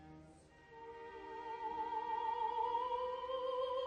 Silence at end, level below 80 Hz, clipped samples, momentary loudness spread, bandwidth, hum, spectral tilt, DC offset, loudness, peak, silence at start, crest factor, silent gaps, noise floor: 0 s; -72 dBFS; under 0.1%; 19 LU; 9.2 kHz; none; -4.5 dB/octave; under 0.1%; -41 LUFS; -28 dBFS; 0 s; 14 dB; none; -62 dBFS